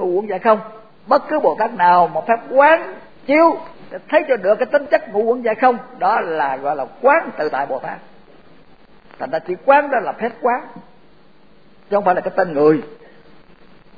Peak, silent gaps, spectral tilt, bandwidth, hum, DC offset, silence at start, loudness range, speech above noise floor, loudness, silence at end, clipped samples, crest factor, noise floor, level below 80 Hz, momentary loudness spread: 0 dBFS; none; -8 dB/octave; 5 kHz; none; 0.5%; 0 s; 5 LU; 35 dB; -17 LUFS; 1.05 s; under 0.1%; 18 dB; -51 dBFS; -62 dBFS; 13 LU